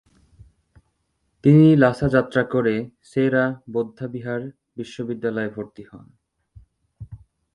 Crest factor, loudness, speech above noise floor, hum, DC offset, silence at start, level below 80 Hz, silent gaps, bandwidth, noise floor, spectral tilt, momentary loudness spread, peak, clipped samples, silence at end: 22 dB; -20 LUFS; 51 dB; none; under 0.1%; 1.45 s; -52 dBFS; none; 10.5 kHz; -71 dBFS; -8.5 dB/octave; 22 LU; 0 dBFS; under 0.1%; 0.4 s